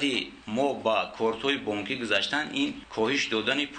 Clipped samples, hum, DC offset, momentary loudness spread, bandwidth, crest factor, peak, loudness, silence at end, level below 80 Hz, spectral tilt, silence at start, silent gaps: under 0.1%; none; under 0.1%; 5 LU; 9.4 kHz; 16 dB; -12 dBFS; -27 LUFS; 0 s; -62 dBFS; -3.5 dB/octave; 0 s; none